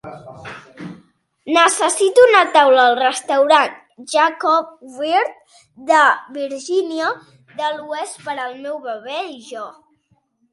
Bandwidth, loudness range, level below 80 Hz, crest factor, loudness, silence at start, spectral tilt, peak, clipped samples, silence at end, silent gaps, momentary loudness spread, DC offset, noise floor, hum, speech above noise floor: 11.5 kHz; 11 LU; -68 dBFS; 18 dB; -16 LUFS; 0.05 s; -2 dB/octave; 0 dBFS; under 0.1%; 0.8 s; none; 23 LU; under 0.1%; -62 dBFS; none; 46 dB